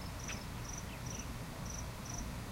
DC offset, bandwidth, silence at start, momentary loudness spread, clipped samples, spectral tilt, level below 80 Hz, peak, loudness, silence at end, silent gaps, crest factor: under 0.1%; 16 kHz; 0 s; 1 LU; under 0.1%; -4 dB/octave; -50 dBFS; -30 dBFS; -44 LUFS; 0 s; none; 14 dB